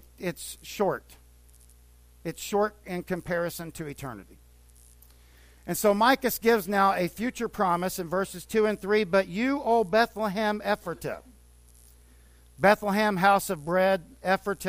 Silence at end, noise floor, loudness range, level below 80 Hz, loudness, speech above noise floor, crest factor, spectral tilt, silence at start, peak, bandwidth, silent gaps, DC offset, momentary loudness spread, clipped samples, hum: 0 s; -55 dBFS; 8 LU; -54 dBFS; -26 LUFS; 29 dB; 20 dB; -4.5 dB/octave; 0.2 s; -8 dBFS; 15.5 kHz; none; under 0.1%; 15 LU; under 0.1%; 60 Hz at -55 dBFS